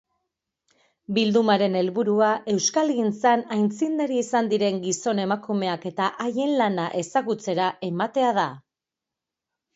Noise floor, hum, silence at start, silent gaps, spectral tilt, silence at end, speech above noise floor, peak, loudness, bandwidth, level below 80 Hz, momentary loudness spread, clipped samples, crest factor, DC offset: -87 dBFS; none; 1.1 s; none; -4.5 dB/octave; 1.15 s; 65 dB; -6 dBFS; -23 LUFS; 8 kHz; -72 dBFS; 5 LU; under 0.1%; 18 dB; under 0.1%